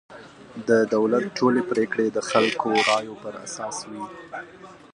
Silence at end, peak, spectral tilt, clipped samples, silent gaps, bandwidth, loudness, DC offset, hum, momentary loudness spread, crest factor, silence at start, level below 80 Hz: 0.15 s; -4 dBFS; -4 dB/octave; under 0.1%; none; 11 kHz; -23 LUFS; under 0.1%; none; 17 LU; 20 dB; 0.1 s; -66 dBFS